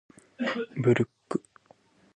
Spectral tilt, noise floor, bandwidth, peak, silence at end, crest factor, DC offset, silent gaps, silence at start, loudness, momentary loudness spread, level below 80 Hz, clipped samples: -7 dB/octave; -61 dBFS; 10 kHz; -10 dBFS; 0.75 s; 20 dB; under 0.1%; none; 0.4 s; -29 LUFS; 10 LU; -68 dBFS; under 0.1%